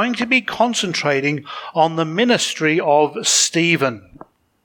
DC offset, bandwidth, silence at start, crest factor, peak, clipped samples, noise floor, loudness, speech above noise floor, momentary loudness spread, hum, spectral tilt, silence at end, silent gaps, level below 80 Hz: under 0.1%; 19 kHz; 0 s; 16 dB; -2 dBFS; under 0.1%; -45 dBFS; -17 LUFS; 27 dB; 8 LU; none; -3 dB/octave; 0.65 s; none; -62 dBFS